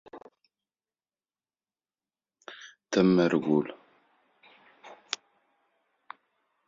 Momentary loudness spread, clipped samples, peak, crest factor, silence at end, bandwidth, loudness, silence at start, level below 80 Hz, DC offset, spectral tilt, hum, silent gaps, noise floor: 27 LU; under 0.1%; -6 dBFS; 26 dB; 1.75 s; 7.6 kHz; -27 LUFS; 0.15 s; -70 dBFS; under 0.1%; -6 dB/octave; none; none; under -90 dBFS